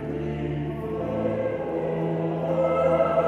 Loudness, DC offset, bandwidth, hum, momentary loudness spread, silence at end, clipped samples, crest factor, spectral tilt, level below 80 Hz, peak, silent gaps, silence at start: -26 LUFS; under 0.1%; 7.8 kHz; none; 8 LU; 0 s; under 0.1%; 16 dB; -9 dB/octave; -46 dBFS; -10 dBFS; none; 0 s